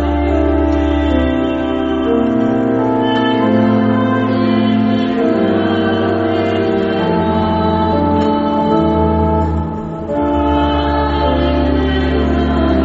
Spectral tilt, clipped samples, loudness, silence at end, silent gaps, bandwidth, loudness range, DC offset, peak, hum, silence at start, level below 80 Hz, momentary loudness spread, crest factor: -6 dB/octave; under 0.1%; -14 LUFS; 0 s; none; 7.4 kHz; 1 LU; under 0.1%; 0 dBFS; none; 0 s; -24 dBFS; 3 LU; 12 dB